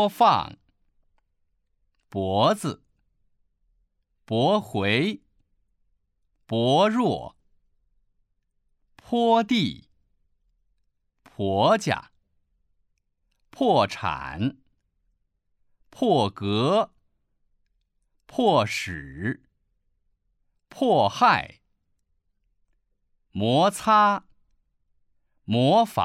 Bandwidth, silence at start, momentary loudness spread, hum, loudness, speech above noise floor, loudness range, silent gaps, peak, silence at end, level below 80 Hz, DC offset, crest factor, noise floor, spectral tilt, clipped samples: 15.5 kHz; 0 s; 13 LU; none; -23 LUFS; 51 dB; 4 LU; none; -6 dBFS; 0 s; -60 dBFS; under 0.1%; 20 dB; -73 dBFS; -5.5 dB/octave; under 0.1%